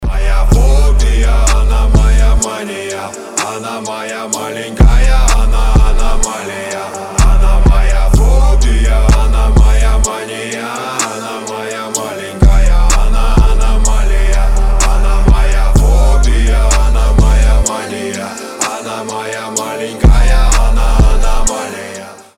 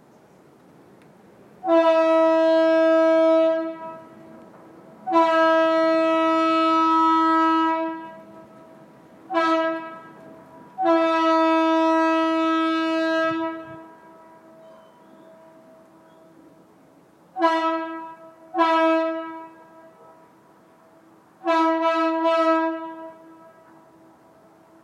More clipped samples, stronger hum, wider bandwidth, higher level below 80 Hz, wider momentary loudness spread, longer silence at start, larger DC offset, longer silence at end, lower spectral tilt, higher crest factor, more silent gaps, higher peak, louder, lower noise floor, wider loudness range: neither; neither; first, 13.5 kHz vs 9 kHz; first, -10 dBFS vs -80 dBFS; second, 10 LU vs 19 LU; second, 0 s vs 1.65 s; neither; second, 0.25 s vs 1.7 s; about the same, -4.5 dB/octave vs -4.5 dB/octave; second, 8 dB vs 16 dB; neither; first, 0 dBFS vs -6 dBFS; first, -13 LUFS vs -20 LUFS; second, -29 dBFS vs -54 dBFS; second, 3 LU vs 9 LU